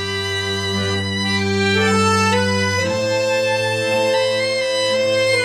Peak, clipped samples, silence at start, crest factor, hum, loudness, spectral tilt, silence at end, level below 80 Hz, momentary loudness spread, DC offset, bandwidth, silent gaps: -4 dBFS; under 0.1%; 0 s; 14 dB; none; -17 LUFS; -4 dB/octave; 0 s; -60 dBFS; 5 LU; under 0.1%; 15 kHz; none